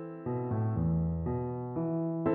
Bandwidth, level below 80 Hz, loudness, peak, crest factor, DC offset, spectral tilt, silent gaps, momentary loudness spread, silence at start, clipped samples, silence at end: 2.8 kHz; -48 dBFS; -33 LUFS; -18 dBFS; 14 dB; under 0.1%; -12 dB/octave; none; 6 LU; 0 s; under 0.1%; 0 s